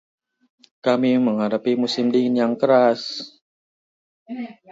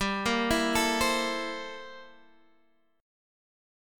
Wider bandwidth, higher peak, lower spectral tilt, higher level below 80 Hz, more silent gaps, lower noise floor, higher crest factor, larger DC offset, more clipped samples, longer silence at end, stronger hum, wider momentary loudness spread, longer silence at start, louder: second, 7.8 kHz vs 17.5 kHz; first, -4 dBFS vs -12 dBFS; first, -6 dB/octave vs -3 dB/octave; second, -72 dBFS vs -50 dBFS; first, 3.42-4.26 s vs none; first, under -90 dBFS vs -69 dBFS; about the same, 18 dB vs 20 dB; neither; neither; second, 0.2 s vs 0.95 s; neither; about the same, 17 LU vs 16 LU; first, 0.85 s vs 0 s; first, -20 LUFS vs -27 LUFS